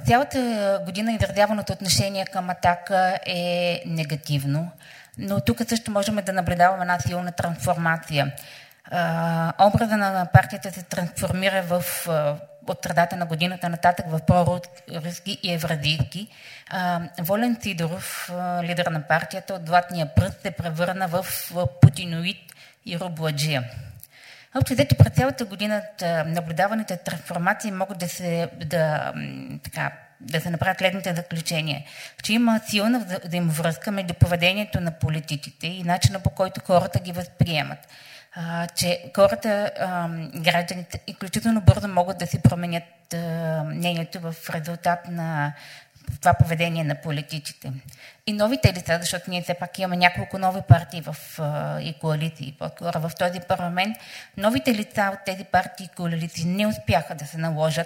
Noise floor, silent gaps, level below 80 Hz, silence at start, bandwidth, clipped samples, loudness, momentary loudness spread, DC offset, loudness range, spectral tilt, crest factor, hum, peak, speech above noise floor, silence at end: -49 dBFS; none; -46 dBFS; 0 s; 16.5 kHz; under 0.1%; -24 LUFS; 13 LU; under 0.1%; 4 LU; -5.5 dB/octave; 24 dB; none; 0 dBFS; 25 dB; 0 s